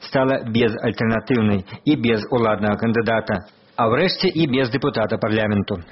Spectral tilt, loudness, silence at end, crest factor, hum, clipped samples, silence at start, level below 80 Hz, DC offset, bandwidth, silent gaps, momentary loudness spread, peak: -5 dB/octave; -20 LUFS; 0.05 s; 16 dB; none; under 0.1%; 0 s; -48 dBFS; under 0.1%; 6 kHz; none; 4 LU; -4 dBFS